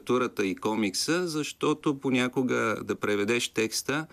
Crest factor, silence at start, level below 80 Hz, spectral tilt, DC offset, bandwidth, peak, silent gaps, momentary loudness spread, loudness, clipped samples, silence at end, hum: 16 dB; 0.05 s; -68 dBFS; -4 dB/octave; under 0.1%; 15.5 kHz; -12 dBFS; none; 3 LU; -28 LUFS; under 0.1%; 0.05 s; none